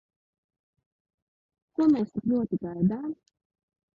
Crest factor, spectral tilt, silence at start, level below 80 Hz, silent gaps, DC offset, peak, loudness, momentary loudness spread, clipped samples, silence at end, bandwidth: 18 dB; -10 dB/octave; 1.8 s; -64 dBFS; none; under 0.1%; -12 dBFS; -27 LUFS; 14 LU; under 0.1%; 0.8 s; 7 kHz